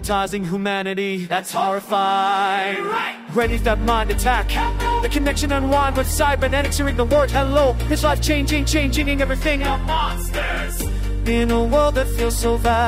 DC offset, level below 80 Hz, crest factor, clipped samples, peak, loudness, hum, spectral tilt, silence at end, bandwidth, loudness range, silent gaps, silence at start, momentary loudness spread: under 0.1%; -24 dBFS; 14 dB; under 0.1%; -4 dBFS; -20 LUFS; none; -4.5 dB/octave; 0 s; 16 kHz; 2 LU; none; 0 s; 6 LU